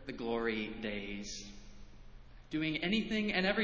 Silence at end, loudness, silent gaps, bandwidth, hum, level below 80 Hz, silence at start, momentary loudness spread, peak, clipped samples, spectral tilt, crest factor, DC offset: 0 s; -36 LUFS; none; 7.8 kHz; none; -56 dBFS; 0 s; 13 LU; -16 dBFS; under 0.1%; -4.5 dB/octave; 20 dB; under 0.1%